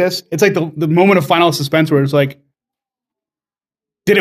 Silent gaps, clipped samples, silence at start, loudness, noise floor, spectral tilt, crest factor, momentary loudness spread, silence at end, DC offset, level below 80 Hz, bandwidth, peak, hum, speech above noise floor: none; under 0.1%; 0 s; -14 LUFS; under -90 dBFS; -5.5 dB/octave; 16 dB; 7 LU; 0 s; under 0.1%; -60 dBFS; 16 kHz; 0 dBFS; none; over 77 dB